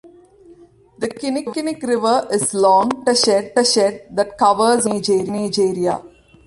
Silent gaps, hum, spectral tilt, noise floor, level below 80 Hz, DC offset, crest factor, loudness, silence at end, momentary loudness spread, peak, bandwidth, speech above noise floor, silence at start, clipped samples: none; none; -3.5 dB/octave; -47 dBFS; -58 dBFS; under 0.1%; 16 dB; -17 LUFS; 0.4 s; 9 LU; -2 dBFS; 11.5 kHz; 30 dB; 0.05 s; under 0.1%